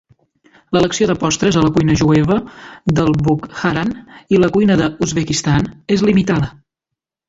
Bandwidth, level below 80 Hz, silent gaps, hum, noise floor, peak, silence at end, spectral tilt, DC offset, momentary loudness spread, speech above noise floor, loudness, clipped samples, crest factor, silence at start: 8 kHz; -40 dBFS; none; none; -82 dBFS; -2 dBFS; 0.8 s; -5.5 dB/octave; under 0.1%; 7 LU; 67 dB; -15 LUFS; under 0.1%; 14 dB; 0.7 s